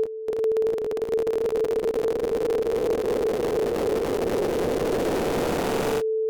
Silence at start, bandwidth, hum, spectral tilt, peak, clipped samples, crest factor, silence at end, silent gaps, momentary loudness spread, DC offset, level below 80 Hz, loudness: 0 s; over 20 kHz; none; -5.5 dB/octave; -18 dBFS; under 0.1%; 8 dB; 0 s; none; 1 LU; under 0.1%; -46 dBFS; -25 LUFS